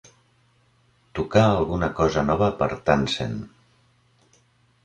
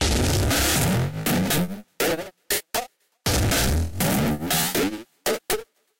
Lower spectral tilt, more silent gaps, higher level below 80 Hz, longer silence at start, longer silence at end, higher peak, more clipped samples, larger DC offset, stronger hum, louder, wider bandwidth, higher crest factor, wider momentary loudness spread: first, -6.5 dB/octave vs -4 dB/octave; neither; second, -44 dBFS vs -34 dBFS; first, 1.15 s vs 0 s; first, 1.35 s vs 0.35 s; first, -4 dBFS vs -12 dBFS; neither; neither; neither; about the same, -22 LUFS vs -23 LUFS; second, 10 kHz vs 17 kHz; first, 22 dB vs 12 dB; first, 14 LU vs 9 LU